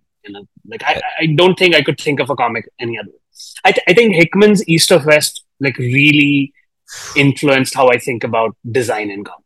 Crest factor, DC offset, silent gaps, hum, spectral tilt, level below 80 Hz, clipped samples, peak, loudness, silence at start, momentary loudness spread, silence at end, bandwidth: 14 dB; under 0.1%; none; none; -4.5 dB/octave; -56 dBFS; 0.3%; 0 dBFS; -13 LUFS; 0.25 s; 14 LU; 0.1 s; 19.5 kHz